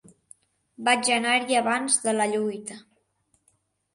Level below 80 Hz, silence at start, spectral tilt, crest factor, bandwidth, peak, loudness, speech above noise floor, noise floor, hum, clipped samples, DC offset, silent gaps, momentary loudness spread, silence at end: -74 dBFS; 0.8 s; -1.5 dB/octave; 20 dB; 11.5 kHz; -6 dBFS; -23 LUFS; 46 dB; -70 dBFS; none; under 0.1%; under 0.1%; none; 10 LU; 1.15 s